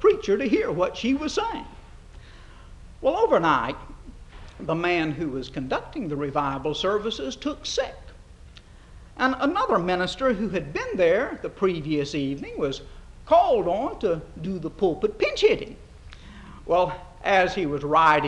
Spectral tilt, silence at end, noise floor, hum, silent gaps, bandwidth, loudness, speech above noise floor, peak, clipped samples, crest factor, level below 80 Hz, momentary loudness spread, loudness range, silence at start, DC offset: -5.5 dB/octave; 0 s; -47 dBFS; none; none; 10 kHz; -24 LUFS; 23 dB; -6 dBFS; under 0.1%; 20 dB; -46 dBFS; 11 LU; 4 LU; 0 s; under 0.1%